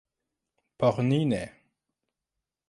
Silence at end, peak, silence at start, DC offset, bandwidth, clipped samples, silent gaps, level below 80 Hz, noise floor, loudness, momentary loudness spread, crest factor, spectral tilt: 1.2 s; -10 dBFS; 0.8 s; under 0.1%; 11.5 kHz; under 0.1%; none; -62 dBFS; -87 dBFS; -27 LUFS; 9 LU; 20 dB; -7.5 dB/octave